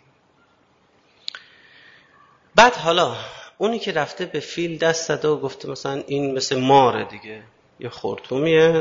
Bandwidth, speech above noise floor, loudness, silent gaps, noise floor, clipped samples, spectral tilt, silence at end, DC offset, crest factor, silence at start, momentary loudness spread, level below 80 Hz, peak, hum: 7.8 kHz; 40 dB; -20 LUFS; none; -60 dBFS; under 0.1%; -4 dB/octave; 0 s; under 0.1%; 22 dB; 1.35 s; 21 LU; -58 dBFS; 0 dBFS; none